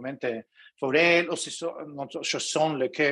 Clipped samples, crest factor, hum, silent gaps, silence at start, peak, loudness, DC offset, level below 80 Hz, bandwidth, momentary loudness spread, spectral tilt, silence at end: under 0.1%; 18 dB; none; none; 0 s; -8 dBFS; -26 LUFS; under 0.1%; -76 dBFS; 11.5 kHz; 15 LU; -3 dB/octave; 0 s